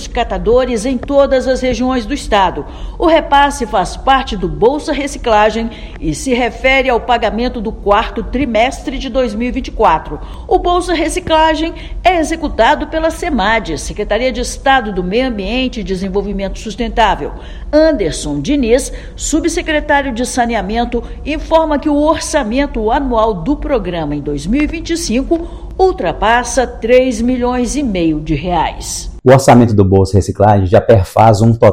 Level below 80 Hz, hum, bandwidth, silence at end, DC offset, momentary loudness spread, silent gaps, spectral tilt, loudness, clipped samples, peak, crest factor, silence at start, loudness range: -26 dBFS; none; 16.5 kHz; 0 s; under 0.1%; 10 LU; none; -5 dB/octave; -13 LUFS; 0.5%; 0 dBFS; 12 dB; 0 s; 4 LU